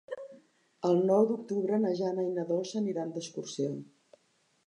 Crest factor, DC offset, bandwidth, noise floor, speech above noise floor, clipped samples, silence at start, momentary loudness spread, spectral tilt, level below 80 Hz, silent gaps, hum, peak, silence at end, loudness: 18 dB; under 0.1%; 10.5 kHz; -72 dBFS; 42 dB; under 0.1%; 0.1 s; 15 LU; -6.5 dB/octave; -84 dBFS; none; none; -14 dBFS; 0.85 s; -31 LUFS